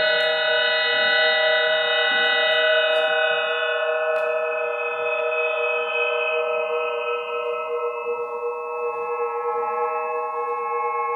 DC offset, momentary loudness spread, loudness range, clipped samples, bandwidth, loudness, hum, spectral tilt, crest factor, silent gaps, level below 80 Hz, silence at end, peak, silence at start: under 0.1%; 9 LU; 8 LU; under 0.1%; 4.9 kHz; -21 LUFS; none; -2 dB/octave; 14 dB; none; -80 dBFS; 0 s; -8 dBFS; 0 s